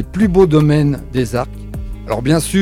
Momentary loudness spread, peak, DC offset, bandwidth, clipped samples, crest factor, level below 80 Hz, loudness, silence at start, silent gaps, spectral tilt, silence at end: 17 LU; 0 dBFS; under 0.1%; 15 kHz; under 0.1%; 14 dB; -30 dBFS; -15 LUFS; 0 s; none; -6.5 dB/octave; 0 s